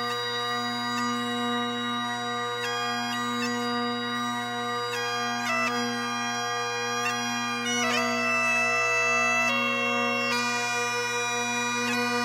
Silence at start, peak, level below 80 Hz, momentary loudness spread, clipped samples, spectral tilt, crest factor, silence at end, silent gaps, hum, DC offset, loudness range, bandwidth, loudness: 0 s; -12 dBFS; -74 dBFS; 6 LU; under 0.1%; -2 dB/octave; 16 dB; 0 s; none; none; under 0.1%; 5 LU; 16.5 kHz; -26 LUFS